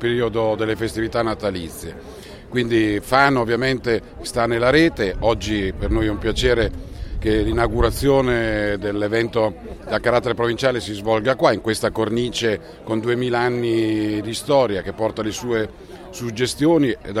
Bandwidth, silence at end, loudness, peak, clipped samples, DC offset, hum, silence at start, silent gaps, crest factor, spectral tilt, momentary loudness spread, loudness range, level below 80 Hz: 15.5 kHz; 0 s; -20 LUFS; 0 dBFS; under 0.1%; under 0.1%; none; 0 s; none; 20 dB; -5.5 dB/octave; 9 LU; 2 LU; -34 dBFS